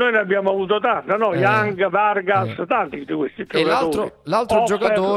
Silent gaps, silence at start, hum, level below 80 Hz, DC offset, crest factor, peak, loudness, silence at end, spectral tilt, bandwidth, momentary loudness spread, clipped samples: none; 0 s; none; -56 dBFS; under 0.1%; 14 dB; -4 dBFS; -19 LUFS; 0 s; -5.5 dB/octave; 13.5 kHz; 6 LU; under 0.1%